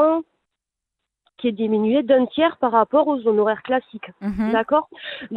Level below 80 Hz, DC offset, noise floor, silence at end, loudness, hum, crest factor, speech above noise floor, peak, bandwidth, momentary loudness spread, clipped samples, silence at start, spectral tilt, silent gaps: -54 dBFS; under 0.1%; -83 dBFS; 0 s; -20 LUFS; none; 16 dB; 64 dB; -4 dBFS; 5 kHz; 11 LU; under 0.1%; 0 s; -8.5 dB/octave; none